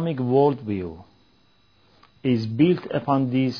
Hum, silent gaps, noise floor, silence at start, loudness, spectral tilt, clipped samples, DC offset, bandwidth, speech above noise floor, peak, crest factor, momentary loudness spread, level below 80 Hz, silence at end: none; none; -61 dBFS; 0 s; -22 LUFS; -9 dB/octave; under 0.1%; under 0.1%; 5.4 kHz; 39 dB; -6 dBFS; 16 dB; 10 LU; -60 dBFS; 0 s